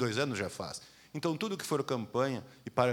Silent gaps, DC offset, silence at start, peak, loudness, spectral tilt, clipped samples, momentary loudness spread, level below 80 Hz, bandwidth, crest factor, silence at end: none; under 0.1%; 0 s; -12 dBFS; -35 LUFS; -5 dB/octave; under 0.1%; 10 LU; -72 dBFS; over 20 kHz; 22 dB; 0 s